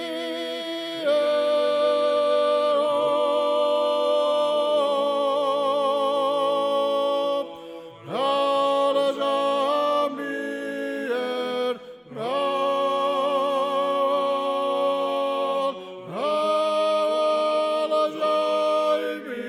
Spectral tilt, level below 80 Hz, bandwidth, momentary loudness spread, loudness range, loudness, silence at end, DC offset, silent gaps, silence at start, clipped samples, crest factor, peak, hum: -4 dB/octave; -76 dBFS; 14 kHz; 8 LU; 4 LU; -23 LUFS; 0 s; under 0.1%; none; 0 s; under 0.1%; 12 dB; -12 dBFS; none